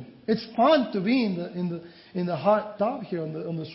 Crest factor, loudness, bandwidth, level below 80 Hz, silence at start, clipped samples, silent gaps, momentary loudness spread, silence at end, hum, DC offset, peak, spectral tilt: 18 dB; -26 LUFS; 5.8 kHz; -68 dBFS; 0 s; under 0.1%; none; 12 LU; 0 s; none; under 0.1%; -8 dBFS; -10.5 dB/octave